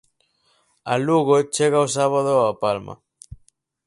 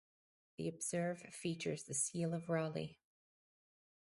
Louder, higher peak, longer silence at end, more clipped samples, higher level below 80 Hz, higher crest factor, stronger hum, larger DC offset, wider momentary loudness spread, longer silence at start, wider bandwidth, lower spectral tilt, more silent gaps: first, -20 LUFS vs -41 LUFS; first, -4 dBFS vs -24 dBFS; second, 0.95 s vs 1.25 s; neither; first, -56 dBFS vs -78 dBFS; about the same, 18 dB vs 18 dB; neither; neither; about the same, 10 LU vs 8 LU; first, 0.85 s vs 0.6 s; about the same, 11.5 kHz vs 11.5 kHz; about the same, -5 dB/octave vs -4.5 dB/octave; neither